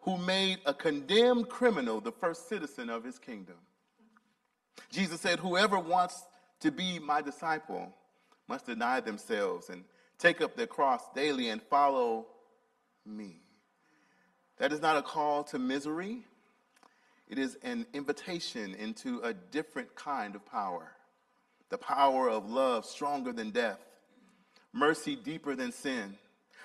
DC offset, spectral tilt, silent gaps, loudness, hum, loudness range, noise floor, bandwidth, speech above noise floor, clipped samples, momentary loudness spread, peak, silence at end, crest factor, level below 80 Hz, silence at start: under 0.1%; -4 dB/octave; none; -32 LUFS; none; 7 LU; -77 dBFS; 13.5 kHz; 44 dB; under 0.1%; 15 LU; -10 dBFS; 0 s; 24 dB; -80 dBFS; 0 s